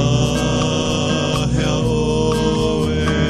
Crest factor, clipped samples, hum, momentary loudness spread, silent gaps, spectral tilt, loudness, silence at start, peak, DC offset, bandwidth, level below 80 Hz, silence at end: 14 dB; under 0.1%; none; 1 LU; none; -5.5 dB/octave; -18 LUFS; 0 s; -2 dBFS; under 0.1%; 13 kHz; -28 dBFS; 0 s